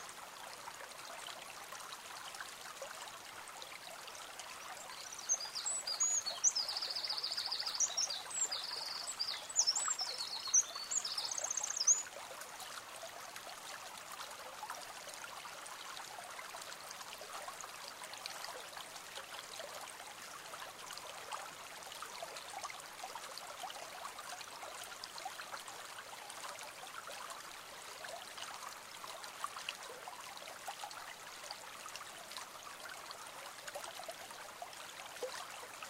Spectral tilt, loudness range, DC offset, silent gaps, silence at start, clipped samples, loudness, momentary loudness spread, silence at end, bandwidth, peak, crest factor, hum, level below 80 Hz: 2 dB/octave; 13 LU; under 0.1%; none; 0 s; under 0.1%; -41 LUFS; 15 LU; 0 s; 16 kHz; -20 dBFS; 24 dB; none; -80 dBFS